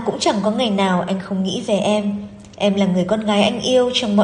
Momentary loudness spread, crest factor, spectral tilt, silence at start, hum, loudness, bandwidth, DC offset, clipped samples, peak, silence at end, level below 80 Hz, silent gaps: 6 LU; 16 dB; -5 dB/octave; 0 s; none; -18 LUFS; 10.5 kHz; under 0.1%; under 0.1%; -2 dBFS; 0 s; -54 dBFS; none